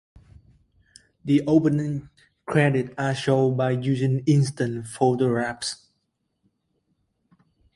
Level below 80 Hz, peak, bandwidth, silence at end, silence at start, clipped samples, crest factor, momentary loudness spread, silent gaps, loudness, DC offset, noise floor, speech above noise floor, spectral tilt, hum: -58 dBFS; -6 dBFS; 11.5 kHz; 2 s; 1.25 s; under 0.1%; 20 dB; 11 LU; none; -23 LUFS; under 0.1%; -75 dBFS; 53 dB; -6.5 dB/octave; none